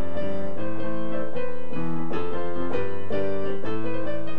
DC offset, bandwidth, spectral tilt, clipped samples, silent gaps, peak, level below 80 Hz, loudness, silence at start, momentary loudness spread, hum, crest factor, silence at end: 20%; 7.8 kHz; -8.5 dB/octave; under 0.1%; none; -10 dBFS; -56 dBFS; -31 LUFS; 0 s; 3 LU; none; 14 dB; 0 s